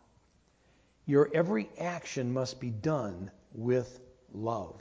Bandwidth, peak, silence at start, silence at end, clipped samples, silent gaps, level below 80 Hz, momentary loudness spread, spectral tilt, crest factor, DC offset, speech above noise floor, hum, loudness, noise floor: 8 kHz; -12 dBFS; 1.05 s; 0 s; under 0.1%; none; -62 dBFS; 18 LU; -6.5 dB/octave; 20 dB; under 0.1%; 36 dB; none; -32 LUFS; -67 dBFS